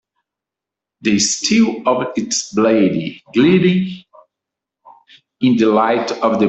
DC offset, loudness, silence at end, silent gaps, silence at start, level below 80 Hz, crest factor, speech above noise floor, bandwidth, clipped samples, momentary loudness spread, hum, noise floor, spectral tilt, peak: under 0.1%; -15 LUFS; 0 s; none; 1.05 s; -58 dBFS; 14 dB; 70 dB; 8.4 kHz; under 0.1%; 7 LU; none; -85 dBFS; -4.5 dB/octave; -2 dBFS